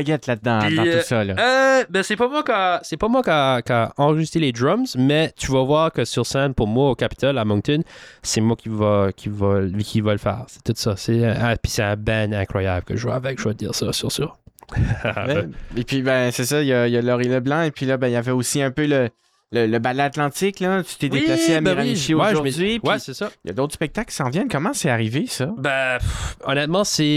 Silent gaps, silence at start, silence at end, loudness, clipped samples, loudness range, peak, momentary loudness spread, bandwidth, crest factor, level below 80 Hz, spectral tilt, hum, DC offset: none; 0 s; 0 s; -20 LUFS; under 0.1%; 4 LU; -6 dBFS; 7 LU; 16 kHz; 14 dB; -42 dBFS; -5 dB/octave; none; under 0.1%